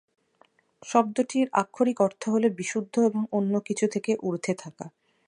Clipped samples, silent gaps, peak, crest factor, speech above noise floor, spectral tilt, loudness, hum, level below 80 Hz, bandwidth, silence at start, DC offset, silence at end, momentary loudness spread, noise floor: under 0.1%; none; -6 dBFS; 20 dB; 38 dB; -5.5 dB/octave; -26 LUFS; none; -78 dBFS; 11 kHz; 0.85 s; under 0.1%; 0.4 s; 9 LU; -64 dBFS